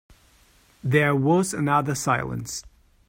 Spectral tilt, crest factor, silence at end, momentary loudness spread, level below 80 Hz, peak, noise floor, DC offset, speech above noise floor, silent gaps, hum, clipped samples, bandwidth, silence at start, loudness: -5.5 dB/octave; 18 dB; 0.4 s; 13 LU; -54 dBFS; -6 dBFS; -58 dBFS; under 0.1%; 35 dB; none; none; under 0.1%; 16 kHz; 0.85 s; -23 LUFS